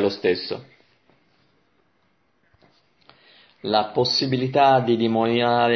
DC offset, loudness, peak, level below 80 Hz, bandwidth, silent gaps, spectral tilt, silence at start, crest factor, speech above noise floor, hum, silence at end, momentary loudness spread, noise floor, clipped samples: under 0.1%; -20 LUFS; -4 dBFS; -64 dBFS; 6.4 kHz; none; -6 dB/octave; 0 s; 18 dB; 47 dB; none; 0 s; 12 LU; -67 dBFS; under 0.1%